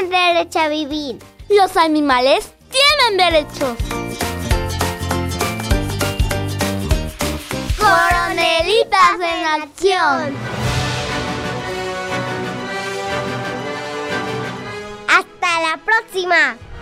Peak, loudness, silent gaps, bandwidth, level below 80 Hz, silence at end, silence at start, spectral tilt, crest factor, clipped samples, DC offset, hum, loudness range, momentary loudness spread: 0 dBFS; -17 LUFS; none; 16 kHz; -30 dBFS; 0 s; 0 s; -4 dB/octave; 16 dB; under 0.1%; under 0.1%; none; 7 LU; 11 LU